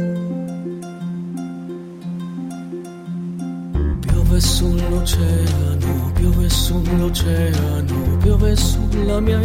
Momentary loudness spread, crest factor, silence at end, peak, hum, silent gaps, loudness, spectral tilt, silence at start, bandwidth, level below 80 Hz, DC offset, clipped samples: 13 LU; 14 dB; 0 s; -4 dBFS; none; none; -19 LUFS; -6 dB/octave; 0 s; 16.5 kHz; -22 dBFS; under 0.1%; under 0.1%